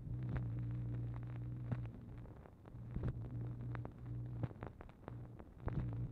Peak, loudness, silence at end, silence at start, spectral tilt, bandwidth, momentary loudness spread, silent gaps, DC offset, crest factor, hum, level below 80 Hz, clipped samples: -26 dBFS; -46 LUFS; 0 s; 0 s; -10.5 dB/octave; 4.1 kHz; 11 LU; none; under 0.1%; 18 dB; none; -54 dBFS; under 0.1%